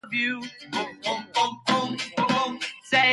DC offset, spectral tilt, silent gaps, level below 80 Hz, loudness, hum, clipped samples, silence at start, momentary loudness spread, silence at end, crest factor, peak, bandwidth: under 0.1%; -3 dB/octave; none; -70 dBFS; -26 LUFS; none; under 0.1%; 0.05 s; 8 LU; 0 s; 18 dB; -8 dBFS; 11.5 kHz